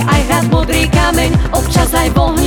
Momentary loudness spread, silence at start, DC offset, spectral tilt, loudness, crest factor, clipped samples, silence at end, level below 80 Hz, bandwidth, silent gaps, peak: 2 LU; 0 s; under 0.1%; -5 dB/octave; -12 LUFS; 12 dB; under 0.1%; 0 s; -18 dBFS; over 20 kHz; none; 0 dBFS